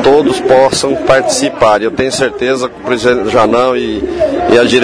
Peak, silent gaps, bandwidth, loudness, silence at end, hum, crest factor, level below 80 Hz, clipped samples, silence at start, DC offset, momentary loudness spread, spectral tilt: 0 dBFS; none; 10.5 kHz; -11 LUFS; 0 s; none; 10 dB; -38 dBFS; 0.8%; 0 s; under 0.1%; 6 LU; -4 dB/octave